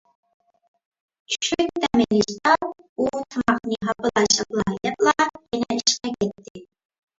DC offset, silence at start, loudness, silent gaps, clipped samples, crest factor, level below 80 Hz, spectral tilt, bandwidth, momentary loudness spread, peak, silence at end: under 0.1%; 1.3 s; -22 LUFS; 2.89-2.96 s, 6.50-6.55 s; under 0.1%; 22 dB; -54 dBFS; -3 dB/octave; 7.8 kHz; 8 LU; -2 dBFS; 0.55 s